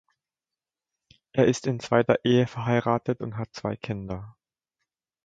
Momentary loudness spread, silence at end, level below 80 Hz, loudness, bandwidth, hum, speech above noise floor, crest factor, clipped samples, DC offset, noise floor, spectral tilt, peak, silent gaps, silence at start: 12 LU; 0.95 s; -58 dBFS; -26 LUFS; 9 kHz; none; over 65 dB; 22 dB; under 0.1%; under 0.1%; under -90 dBFS; -6.5 dB/octave; -6 dBFS; none; 1.35 s